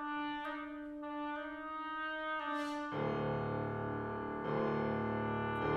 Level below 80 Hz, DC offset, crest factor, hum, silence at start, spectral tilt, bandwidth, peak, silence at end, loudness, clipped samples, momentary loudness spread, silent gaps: -62 dBFS; under 0.1%; 14 dB; none; 0 s; -7.5 dB/octave; 12 kHz; -24 dBFS; 0 s; -39 LUFS; under 0.1%; 7 LU; none